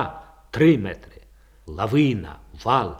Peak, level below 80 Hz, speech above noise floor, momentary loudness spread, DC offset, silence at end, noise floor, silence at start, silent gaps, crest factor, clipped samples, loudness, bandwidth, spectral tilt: -4 dBFS; -46 dBFS; 30 dB; 21 LU; under 0.1%; 0 s; -50 dBFS; 0 s; none; 18 dB; under 0.1%; -22 LUFS; 13 kHz; -7.5 dB/octave